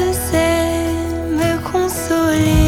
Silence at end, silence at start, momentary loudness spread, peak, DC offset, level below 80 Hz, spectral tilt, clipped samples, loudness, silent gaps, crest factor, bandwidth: 0 s; 0 s; 5 LU; -2 dBFS; under 0.1%; -26 dBFS; -5.5 dB/octave; under 0.1%; -17 LUFS; none; 14 dB; 18 kHz